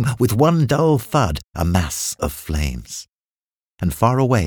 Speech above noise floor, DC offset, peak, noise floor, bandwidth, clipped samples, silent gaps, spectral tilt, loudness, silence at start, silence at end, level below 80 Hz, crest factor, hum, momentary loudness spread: over 72 dB; under 0.1%; -2 dBFS; under -90 dBFS; over 20 kHz; under 0.1%; 3.09-3.19 s, 3.26-3.77 s; -6 dB/octave; -19 LUFS; 0 s; 0 s; -32 dBFS; 18 dB; none; 10 LU